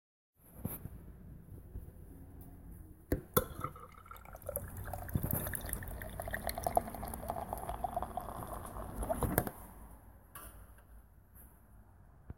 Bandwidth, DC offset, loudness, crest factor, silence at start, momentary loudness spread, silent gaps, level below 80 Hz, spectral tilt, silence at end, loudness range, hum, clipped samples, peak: 17 kHz; under 0.1%; -40 LUFS; 32 dB; 0.4 s; 23 LU; none; -50 dBFS; -5 dB/octave; 0 s; 3 LU; none; under 0.1%; -10 dBFS